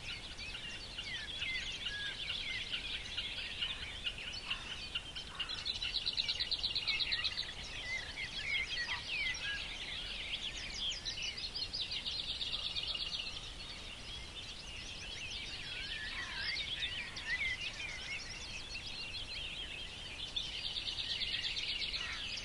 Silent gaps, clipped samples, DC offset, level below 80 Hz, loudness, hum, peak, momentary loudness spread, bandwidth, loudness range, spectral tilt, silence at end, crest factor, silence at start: none; under 0.1%; under 0.1%; -54 dBFS; -38 LUFS; none; -20 dBFS; 9 LU; 11.5 kHz; 5 LU; -1 dB/octave; 0 s; 20 dB; 0 s